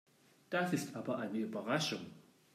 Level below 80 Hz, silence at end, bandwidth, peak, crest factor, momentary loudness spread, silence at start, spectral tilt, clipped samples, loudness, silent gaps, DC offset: -86 dBFS; 0.35 s; 15.5 kHz; -22 dBFS; 18 dB; 6 LU; 0.5 s; -4.5 dB/octave; under 0.1%; -38 LUFS; none; under 0.1%